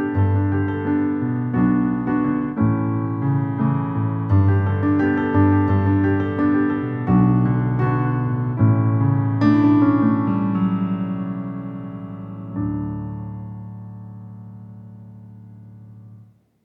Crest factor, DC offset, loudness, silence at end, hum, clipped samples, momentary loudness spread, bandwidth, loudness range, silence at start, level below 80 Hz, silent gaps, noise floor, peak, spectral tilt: 16 dB; under 0.1%; -20 LUFS; 0.45 s; none; under 0.1%; 17 LU; 5.2 kHz; 13 LU; 0 s; -46 dBFS; none; -48 dBFS; -4 dBFS; -11.5 dB/octave